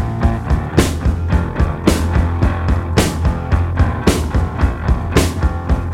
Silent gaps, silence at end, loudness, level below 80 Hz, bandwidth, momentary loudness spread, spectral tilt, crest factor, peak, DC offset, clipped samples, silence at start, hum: none; 0 s; -17 LUFS; -20 dBFS; 16 kHz; 4 LU; -6 dB/octave; 16 dB; 0 dBFS; under 0.1%; under 0.1%; 0 s; none